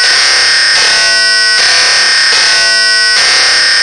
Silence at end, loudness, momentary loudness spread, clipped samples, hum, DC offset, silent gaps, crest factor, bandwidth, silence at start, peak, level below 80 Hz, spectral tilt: 0 s; -5 LUFS; 1 LU; 0.3%; none; 0.5%; none; 8 dB; 12 kHz; 0 s; 0 dBFS; -46 dBFS; 2.5 dB/octave